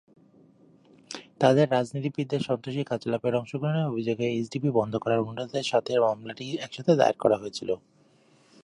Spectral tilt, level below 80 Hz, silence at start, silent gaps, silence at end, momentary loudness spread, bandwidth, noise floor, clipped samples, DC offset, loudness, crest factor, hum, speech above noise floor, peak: -6.5 dB/octave; -68 dBFS; 1.1 s; none; 0.85 s; 12 LU; 11 kHz; -61 dBFS; under 0.1%; under 0.1%; -27 LUFS; 22 dB; none; 35 dB; -6 dBFS